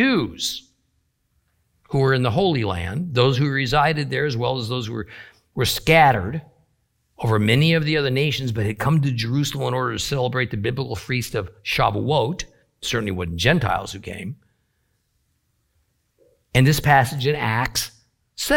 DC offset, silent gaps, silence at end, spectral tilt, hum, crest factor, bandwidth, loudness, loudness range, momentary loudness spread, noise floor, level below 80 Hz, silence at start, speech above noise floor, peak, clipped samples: under 0.1%; none; 0 s; -5 dB/octave; none; 20 dB; 17 kHz; -21 LUFS; 6 LU; 14 LU; -69 dBFS; -44 dBFS; 0 s; 49 dB; -2 dBFS; under 0.1%